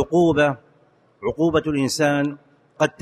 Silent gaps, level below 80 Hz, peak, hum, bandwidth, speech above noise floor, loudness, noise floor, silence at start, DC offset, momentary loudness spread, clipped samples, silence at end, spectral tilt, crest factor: none; -50 dBFS; -6 dBFS; none; 13 kHz; 38 dB; -21 LUFS; -58 dBFS; 0 s; under 0.1%; 11 LU; under 0.1%; 0.1 s; -5.5 dB/octave; 16 dB